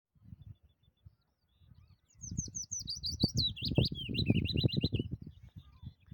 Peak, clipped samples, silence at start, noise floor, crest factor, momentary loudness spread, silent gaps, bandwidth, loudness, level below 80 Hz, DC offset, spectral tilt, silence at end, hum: -12 dBFS; under 0.1%; 0.25 s; -74 dBFS; 24 dB; 23 LU; none; 17.5 kHz; -34 LUFS; -52 dBFS; under 0.1%; -4.5 dB/octave; 0.2 s; none